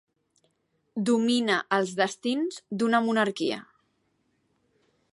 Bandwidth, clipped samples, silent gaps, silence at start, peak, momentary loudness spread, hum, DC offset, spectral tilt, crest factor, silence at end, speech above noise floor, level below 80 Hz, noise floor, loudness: 11.5 kHz; under 0.1%; none; 0.95 s; -10 dBFS; 8 LU; none; under 0.1%; -4.5 dB/octave; 18 dB; 1.55 s; 48 dB; -78 dBFS; -73 dBFS; -26 LUFS